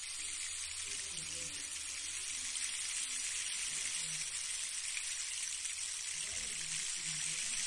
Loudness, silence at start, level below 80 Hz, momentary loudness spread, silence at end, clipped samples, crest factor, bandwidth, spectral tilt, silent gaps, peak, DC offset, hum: -37 LUFS; 0 s; -68 dBFS; 3 LU; 0 s; under 0.1%; 18 dB; 11.5 kHz; 2 dB/octave; none; -24 dBFS; under 0.1%; none